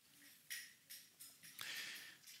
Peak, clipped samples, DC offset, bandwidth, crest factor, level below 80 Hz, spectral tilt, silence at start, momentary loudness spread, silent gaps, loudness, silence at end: -28 dBFS; under 0.1%; under 0.1%; 16 kHz; 28 dB; under -90 dBFS; 1 dB/octave; 0 s; 12 LU; none; -52 LUFS; 0 s